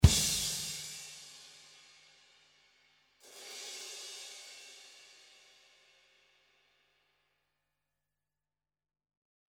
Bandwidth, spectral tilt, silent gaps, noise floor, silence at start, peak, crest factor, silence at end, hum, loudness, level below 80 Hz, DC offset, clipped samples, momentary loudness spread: 17 kHz; -3.5 dB/octave; none; under -90 dBFS; 0 s; -6 dBFS; 32 dB; 4.75 s; none; -35 LUFS; -44 dBFS; under 0.1%; under 0.1%; 26 LU